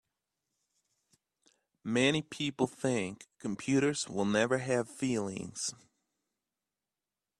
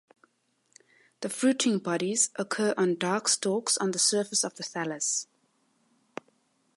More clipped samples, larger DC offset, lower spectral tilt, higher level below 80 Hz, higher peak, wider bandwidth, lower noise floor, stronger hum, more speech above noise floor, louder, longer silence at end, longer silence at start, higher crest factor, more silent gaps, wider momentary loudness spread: neither; neither; first, -4.5 dB/octave vs -2.5 dB/octave; first, -72 dBFS vs -82 dBFS; about the same, -12 dBFS vs -10 dBFS; about the same, 12.5 kHz vs 12 kHz; first, under -90 dBFS vs -72 dBFS; neither; first, over 58 dB vs 44 dB; second, -32 LUFS vs -27 LUFS; first, 1.65 s vs 1.5 s; first, 1.85 s vs 1.2 s; about the same, 22 dB vs 20 dB; neither; second, 10 LU vs 17 LU